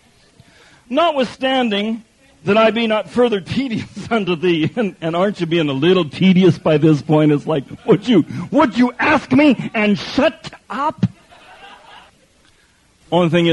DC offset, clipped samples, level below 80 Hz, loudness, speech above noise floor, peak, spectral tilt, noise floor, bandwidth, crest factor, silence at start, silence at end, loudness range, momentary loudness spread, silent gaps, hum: under 0.1%; under 0.1%; -52 dBFS; -16 LUFS; 39 dB; -2 dBFS; -7 dB/octave; -54 dBFS; 11 kHz; 16 dB; 0.9 s; 0 s; 6 LU; 9 LU; none; none